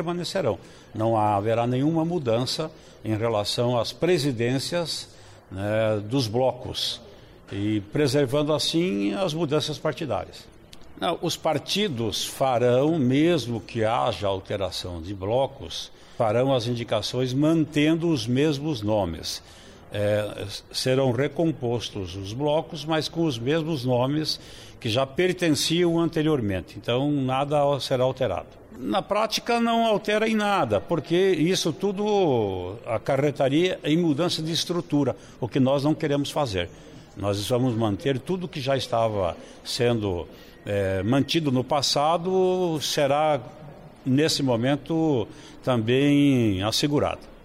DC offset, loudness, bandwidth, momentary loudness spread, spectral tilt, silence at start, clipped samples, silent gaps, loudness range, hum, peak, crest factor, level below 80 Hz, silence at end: under 0.1%; -24 LUFS; 16 kHz; 10 LU; -5.5 dB/octave; 0 s; under 0.1%; none; 3 LU; none; -12 dBFS; 12 dB; -54 dBFS; 0.1 s